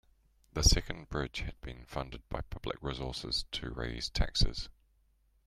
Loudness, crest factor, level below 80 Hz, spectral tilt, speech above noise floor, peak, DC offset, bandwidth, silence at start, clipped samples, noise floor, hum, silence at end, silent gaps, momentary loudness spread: -35 LUFS; 24 dB; -38 dBFS; -3.5 dB/octave; 36 dB; -10 dBFS; under 0.1%; 15 kHz; 0.55 s; under 0.1%; -70 dBFS; none; 0.75 s; none; 14 LU